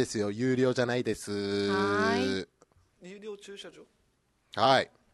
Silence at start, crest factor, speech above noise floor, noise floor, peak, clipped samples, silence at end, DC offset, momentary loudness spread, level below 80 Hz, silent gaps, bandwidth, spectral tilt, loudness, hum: 0 s; 22 dB; 43 dB; -72 dBFS; -8 dBFS; under 0.1%; 0.25 s; under 0.1%; 20 LU; -62 dBFS; none; 12.5 kHz; -5 dB/octave; -28 LUFS; none